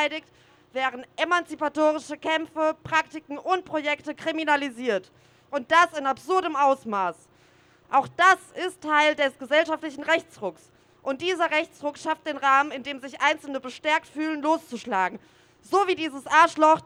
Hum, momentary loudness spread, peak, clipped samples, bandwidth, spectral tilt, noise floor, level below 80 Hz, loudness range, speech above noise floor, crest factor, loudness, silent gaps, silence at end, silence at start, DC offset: none; 13 LU; -6 dBFS; under 0.1%; over 20 kHz; -3 dB/octave; -58 dBFS; -70 dBFS; 3 LU; 33 dB; 20 dB; -24 LUFS; none; 0.05 s; 0 s; under 0.1%